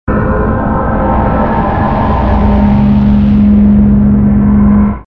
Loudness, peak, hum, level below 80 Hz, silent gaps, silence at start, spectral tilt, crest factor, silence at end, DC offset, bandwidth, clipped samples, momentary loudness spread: -9 LUFS; 0 dBFS; none; -16 dBFS; none; 0.05 s; -11 dB/octave; 8 dB; 0.05 s; under 0.1%; 4.4 kHz; under 0.1%; 5 LU